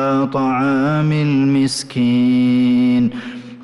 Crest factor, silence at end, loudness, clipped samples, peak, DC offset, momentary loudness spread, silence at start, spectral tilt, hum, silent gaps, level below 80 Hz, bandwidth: 6 dB; 0 s; -16 LUFS; under 0.1%; -8 dBFS; under 0.1%; 5 LU; 0 s; -6.5 dB/octave; none; none; -54 dBFS; 11.5 kHz